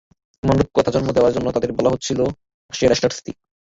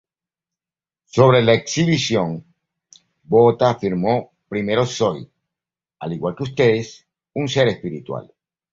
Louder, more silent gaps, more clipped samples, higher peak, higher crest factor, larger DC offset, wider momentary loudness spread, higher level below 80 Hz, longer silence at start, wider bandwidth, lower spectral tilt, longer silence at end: about the same, -19 LUFS vs -19 LUFS; first, 2.54-2.69 s vs none; neither; about the same, -2 dBFS vs -2 dBFS; about the same, 16 dB vs 18 dB; neither; second, 8 LU vs 17 LU; first, -42 dBFS vs -54 dBFS; second, 0.45 s vs 1.15 s; about the same, 7.8 kHz vs 7.8 kHz; about the same, -5.5 dB/octave vs -5.5 dB/octave; second, 0.35 s vs 0.5 s